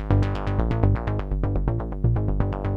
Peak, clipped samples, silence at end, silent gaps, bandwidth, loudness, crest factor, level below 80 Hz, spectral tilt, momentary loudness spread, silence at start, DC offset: -6 dBFS; under 0.1%; 0 s; none; 5.4 kHz; -25 LUFS; 16 dB; -28 dBFS; -9.5 dB/octave; 4 LU; 0 s; under 0.1%